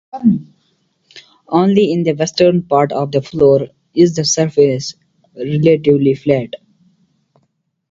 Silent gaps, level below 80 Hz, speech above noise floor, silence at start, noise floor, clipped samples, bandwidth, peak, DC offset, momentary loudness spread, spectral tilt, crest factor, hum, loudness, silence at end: none; -52 dBFS; 52 dB; 0.15 s; -65 dBFS; under 0.1%; 7.8 kHz; 0 dBFS; under 0.1%; 10 LU; -5.5 dB/octave; 14 dB; none; -14 LUFS; 1.35 s